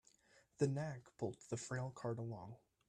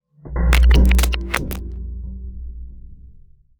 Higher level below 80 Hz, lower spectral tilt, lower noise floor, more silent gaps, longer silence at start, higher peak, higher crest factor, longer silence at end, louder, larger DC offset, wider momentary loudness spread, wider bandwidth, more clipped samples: second, -76 dBFS vs -18 dBFS; first, -6.5 dB/octave vs -5 dB/octave; first, -73 dBFS vs -46 dBFS; neither; about the same, 0.35 s vs 0.25 s; second, -24 dBFS vs -2 dBFS; about the same, 22 dB vs 18 dB; second, 0.3 s vs 0.55 s; second, -45 LUFS vs -18 LUFS; neither; second, 9 LU vs 22 LU; second, 11 kHz vs over 20 kHz; neither